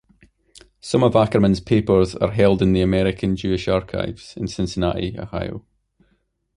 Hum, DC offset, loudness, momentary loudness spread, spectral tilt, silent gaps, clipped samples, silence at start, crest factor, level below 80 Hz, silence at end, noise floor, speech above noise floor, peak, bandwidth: none; under 0.1%; -20 LUFS; 13 LU; -7 dB/octave; none; under 0.1%; 0.85 s; 18 dB; -38 dBFS; 0.95 s; -66 dBFS; 47 dB; -2 dBFS; 11 kHz